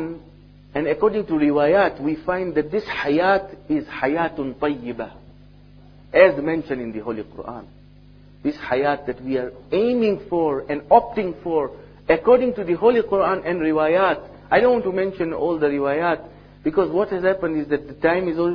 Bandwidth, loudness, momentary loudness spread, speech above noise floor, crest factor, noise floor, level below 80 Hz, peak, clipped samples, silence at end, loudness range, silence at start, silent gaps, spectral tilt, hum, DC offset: 5.4 kHz; -21 LUFS; 12 LU; 27 dB; 20 dB; -47 dBFS; -50 dBFS; 0 dBFS; under 0.1%; 0 s; 5 LU; 0 s; none; -8.5 dB/octave; 50 Hz at -50 dBFS; under 0.1%